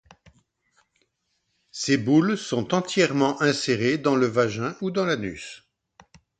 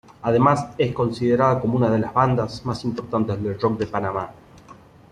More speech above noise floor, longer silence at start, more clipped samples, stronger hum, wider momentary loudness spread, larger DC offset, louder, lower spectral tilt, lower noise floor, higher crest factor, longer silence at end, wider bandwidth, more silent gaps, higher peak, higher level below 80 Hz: first, 52 dB vs 26 dB; first, 1.75 s vs 0.25 s; neither; neither; about the same, 10 LU vs 9 LU; neither; about the same, -23 LUFS vs -22 LUFS; second, -5 dB/octave vs -8 dB/octave; first, -74 dBFS vs -47 dBFS; about the same, 18 dB vs 18 dB; first, 0.85 s vs 0.4 s; second, 9.4 kHz vs 10.5 kHz; neither; about the same, -6 dBFS vs -4 dBFS; second, -62 dBFS vs -50 dBFS